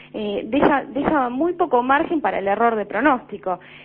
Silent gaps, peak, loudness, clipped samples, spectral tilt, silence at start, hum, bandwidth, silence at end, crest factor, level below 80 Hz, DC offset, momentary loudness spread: none; -2 dBFS; -20 LUFS; under 0.1%; -10.5 dB/octave; 0 s; none; 5 kHz; 0 s; 18 dB; -50 dBFS; under 0.1%; 9 LU